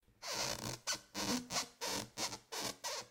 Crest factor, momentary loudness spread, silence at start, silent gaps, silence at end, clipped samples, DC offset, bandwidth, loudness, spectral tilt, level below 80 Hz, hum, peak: 18 dB; 4 LU; 0.2 s; none; 0 s; under 0.1%; under 0.1%; 18 kHz; -40 LUFS; -1.5 dB/octave; -68 dBFS; none; -24 dBFS